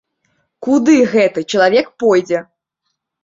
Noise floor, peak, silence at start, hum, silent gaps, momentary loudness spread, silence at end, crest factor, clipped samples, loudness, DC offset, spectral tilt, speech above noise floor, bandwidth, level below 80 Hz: -73 dBFS; 0 dBFS; 0.6 s; none; none; 10 LU; 0.8 s; 14 dB; under 0.1%; -14 LUFS; under 0.1%; -5 dB/octave; 61 dB; 7.8 kHz; -60 dBFS